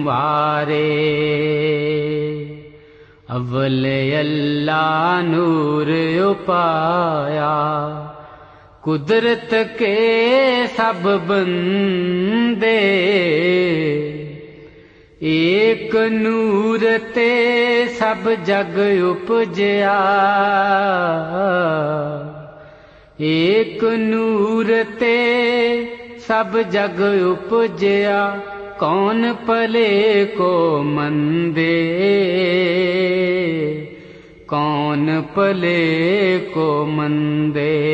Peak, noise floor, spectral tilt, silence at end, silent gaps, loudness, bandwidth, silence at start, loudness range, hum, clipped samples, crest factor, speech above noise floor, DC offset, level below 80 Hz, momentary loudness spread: -4 dBFS; -45 dBFS; -7.5 dB/octave; 0 s; none; -17 LUFS; 8.2 kHz; 0 s; 3 LU; none; under 0.1%; 14 dB; 29 dB; under 0.1%; -56 dBFS; 8 LU